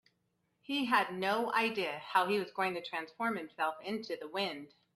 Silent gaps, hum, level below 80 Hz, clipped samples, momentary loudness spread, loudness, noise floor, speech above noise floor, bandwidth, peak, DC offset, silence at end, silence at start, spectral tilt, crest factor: none; none; -82 dBFS; under 0.1%; 9 LU; -34 LUFS; -79 dBFS; 44 dB; 14.5 kHz; -14 dBFS; under 0.1%; 0.3 s; 0.7 s; -4.5 dB/octave; 20 dB